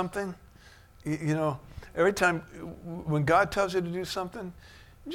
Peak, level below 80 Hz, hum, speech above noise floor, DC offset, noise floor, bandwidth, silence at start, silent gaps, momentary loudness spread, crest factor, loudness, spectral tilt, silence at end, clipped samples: -10 dBFS; -52 dBFS; none; 25 dB; under 0.1%; -54 dBFS; 16.5 kHz; 0 s; none; 18 LU; 20 dB; -29 LUFS; -5.5 dB/octave; 0 s; under 0.1%